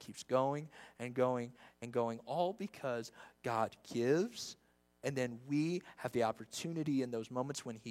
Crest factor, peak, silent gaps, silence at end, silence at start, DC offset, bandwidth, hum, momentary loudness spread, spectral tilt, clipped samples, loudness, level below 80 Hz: 18 dB; -20 dBFS; none; 0 s; 0 s; under 0.1%; 16 kHz; none; 11 LU; -5.5 dB/octave; under 0.1%; -39 LUFS; -80 dBFS